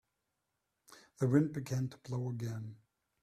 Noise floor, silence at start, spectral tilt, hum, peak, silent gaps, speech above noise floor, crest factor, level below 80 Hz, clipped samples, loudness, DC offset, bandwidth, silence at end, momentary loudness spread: -85 dBFS; 0.9 s; -8 dB/octave; none; -14 dBFS; none; 51 dB; 22 dB; -72 dBFS; under 0.1%; -36 LUFS; under 0.1%; 14 kHz; 0.5 s; 12 LU